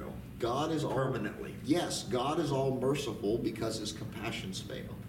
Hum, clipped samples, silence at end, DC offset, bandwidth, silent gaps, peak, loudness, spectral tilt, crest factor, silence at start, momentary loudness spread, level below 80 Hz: none; under 0.1%; 0 s; under 0.1%; 17 kHz; none; -16 dBFS; -34 LUFS; -5.5 dB/octave; 18 dB; 0 s; 8 LU; -56 dBFS